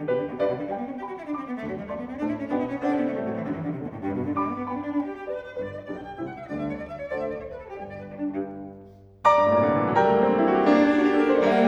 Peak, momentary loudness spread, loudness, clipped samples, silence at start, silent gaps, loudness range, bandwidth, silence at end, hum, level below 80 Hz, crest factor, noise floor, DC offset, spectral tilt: -6 dBFS; 16 LU; -25 LUFS; under 0.1%; 0 s; none; 12 LU; 7.4 kHz; 0 s; none; -56 dBFS; 20 dB; -48 dBFS; under 0.1%; -7.5 dB/octave